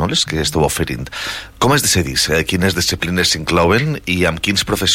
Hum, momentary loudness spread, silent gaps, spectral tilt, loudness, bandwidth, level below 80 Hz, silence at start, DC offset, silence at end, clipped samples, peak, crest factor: none; 8 LU; none; -3.5 dB/octave; -16 LUFS; 16.5 kHz; -34 dBFS; 0 s; under 0.1%; 0 s; under 0.1%; -2 dBFS; 14 dB